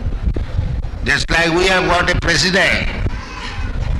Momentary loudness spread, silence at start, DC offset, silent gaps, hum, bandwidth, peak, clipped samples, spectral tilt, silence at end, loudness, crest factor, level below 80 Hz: 12 LU; 0 s; under 0.1%; none; none; 12 kHz; -4 dBFS; under 0.1%; -4 dB/octave; 0 s; -16 LUFS; 12 dB; -22 dBFS